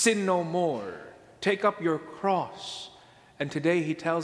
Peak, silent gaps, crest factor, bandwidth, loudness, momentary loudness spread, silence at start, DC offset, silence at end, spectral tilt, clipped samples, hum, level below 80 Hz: -8 dBFS; none; 20 dB; 11 kHz; -28 LUFS; 14 LU; 0 s; under 0.1%; 0 s; -4.5 dB/octave; under 0.1%; none; -70 dBFS